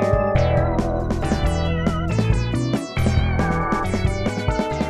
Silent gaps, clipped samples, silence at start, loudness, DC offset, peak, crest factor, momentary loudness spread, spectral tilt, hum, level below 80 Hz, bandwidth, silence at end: none; under 0.1%; 0 s; -21 LUFS; under 0.1%; -6 dBFS; 14 dB; 4 LU; -7 dB/octave; none; -28 dBFS; 12.5 kHz; 0 s